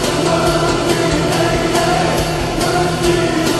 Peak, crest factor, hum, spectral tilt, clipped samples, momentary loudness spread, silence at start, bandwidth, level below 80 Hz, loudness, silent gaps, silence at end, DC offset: -2 dBFS; 14 dB; none; -4.5 dB/octave; under 0.1%; 2 LU; 0 s; 13 kHz; -30 dBFS; -15 LUFS; none; 0 s; 0.1%